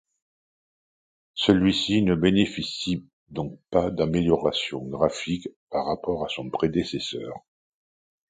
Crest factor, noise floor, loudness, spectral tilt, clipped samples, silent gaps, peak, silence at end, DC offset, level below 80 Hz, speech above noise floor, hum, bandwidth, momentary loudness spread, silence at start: 22 dB; under -90 dBFS; -25 LUFS; -6 dB/octave; under 0.1%; 3.13-3.26 s, 5.56-5.67 s; -4 dBFS; 0.9 s; under 0.1%; -50 dBFS; over 66 dB; none; 9.4 kHz; 13 LU; 1.35 s